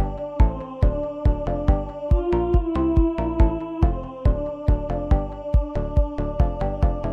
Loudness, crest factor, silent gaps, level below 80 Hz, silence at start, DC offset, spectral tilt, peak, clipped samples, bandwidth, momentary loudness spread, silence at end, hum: -23 LUFS; 16 dB; none; -22 dBFS; 0 s; 0.2%; -10 dB/octave; -4 dBFS; under 0.1%; 4.5 kHz; 3 LU; 0 s; none